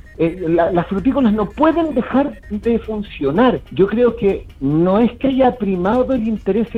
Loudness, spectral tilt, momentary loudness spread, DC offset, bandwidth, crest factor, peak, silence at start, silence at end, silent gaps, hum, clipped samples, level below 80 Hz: -17 LUFS; -9 dB/octave; 6 LU; under 0.1%; 5.6 kHz; 16 dB; -2 dBFS; 0.1 s; 0 s; none; none; under 0.1%; -38 dBFS